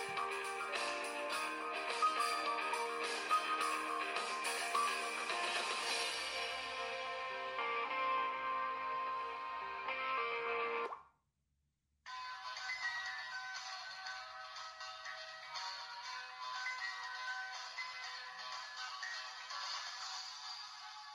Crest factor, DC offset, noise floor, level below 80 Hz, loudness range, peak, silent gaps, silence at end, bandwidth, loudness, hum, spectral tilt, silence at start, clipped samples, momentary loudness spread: 18 dB; under 0.1%; -83 dBFS; -82 dBFS; 8 LU; -24 dBFS; none; 0 s; 16 kHz; -40 LUFS; none; 0 dB/octave; 0 s; under 0.1%; 10 LU